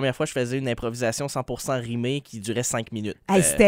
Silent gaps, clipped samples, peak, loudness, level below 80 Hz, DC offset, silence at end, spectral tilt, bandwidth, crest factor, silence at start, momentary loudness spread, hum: none; under 0.1%; -4 dBFS; -26 LUFS; -48 dBFS; under 0.1%; 0 s; -4.5 dB/octave; 16 kHz; 20 dB; 0 s; 8 LU; none